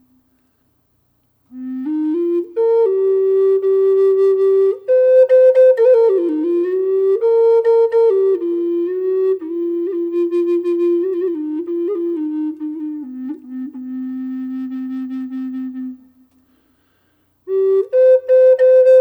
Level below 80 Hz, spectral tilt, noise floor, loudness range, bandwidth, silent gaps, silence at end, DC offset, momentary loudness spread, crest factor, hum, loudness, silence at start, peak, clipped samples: -72 dBFS; -6.5 dB/octave; -62 dBFS; 14 LU; 4.5 kHz; none; 0 s; under 0.1%; 16 LU; 12 dB; none; -15 LUFS; 1.55 s; -4 dBFS; under 0.1%